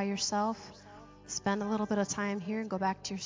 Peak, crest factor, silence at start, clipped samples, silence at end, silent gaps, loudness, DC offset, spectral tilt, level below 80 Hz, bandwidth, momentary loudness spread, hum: -18 dBFS; 16 dB; 0 s; under 0.1%; 0 s; none; -33 LUFS; under 0.1%; -4 dB/octave; -64 dBFS; 7.8 kHz; 19 LU; none